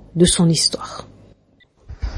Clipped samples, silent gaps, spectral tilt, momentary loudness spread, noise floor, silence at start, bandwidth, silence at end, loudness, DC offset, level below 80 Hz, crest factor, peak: under 0.1%; none; -4.5 dB/octave; 19 LU; -56 dBFS; 0.15 s; 11.5 kHz; 0 s; -16 LUFS; under 0.1%; -34 dBFS; 18 dB; -2 dBFS